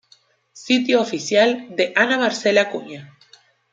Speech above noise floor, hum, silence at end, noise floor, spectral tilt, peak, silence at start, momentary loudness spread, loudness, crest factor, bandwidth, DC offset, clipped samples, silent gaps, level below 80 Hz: 38 dB; none; 0.65 s; -57 dBFS; -3.5 dB/octave; -2 dBFS; 0.55 s; 11 LU; -18 LUFS; 18 dB; 9.2 kHz; under 0.1%; under 0.1%; none; -72 dBFS